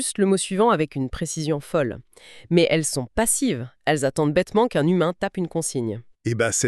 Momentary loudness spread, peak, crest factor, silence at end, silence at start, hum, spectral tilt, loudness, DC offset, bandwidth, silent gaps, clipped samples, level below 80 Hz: 8 LU; -6 dBFS; 16 dB; 0 s; 0 s; none; -4.5 dB/octave; -22 LUFS; under 0.1%; 13.5 kHz; none; under 0.1%; -48 dBFS